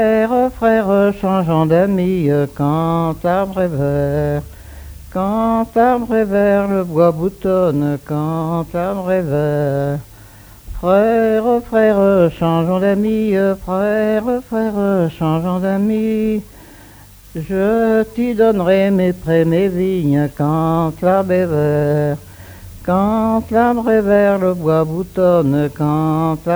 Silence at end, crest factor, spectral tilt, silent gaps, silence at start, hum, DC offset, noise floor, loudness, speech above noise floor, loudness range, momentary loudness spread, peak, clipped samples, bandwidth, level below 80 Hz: 0 s; 14 dB; -8.5 dB/octave; none; 0 s; none; under 0.1%; -41 dBFS; -16 LUFS; 26 dB; 3 LU; 7 LU; 0 dBFS; under 0.1%; over 20 kHz; -40 dBFS